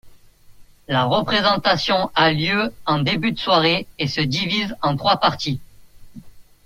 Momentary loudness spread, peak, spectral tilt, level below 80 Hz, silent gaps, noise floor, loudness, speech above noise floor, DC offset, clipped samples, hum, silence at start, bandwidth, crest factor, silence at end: 6 LU; -2 dBFS; -5.5 dB/octave; -50 dBFS; none; -46 dBFS; -19 LUFS; 27 dB; under 0.1%; under 0.1%; none; 0.05 s; 16 kHz; 18 dB; 0.25 s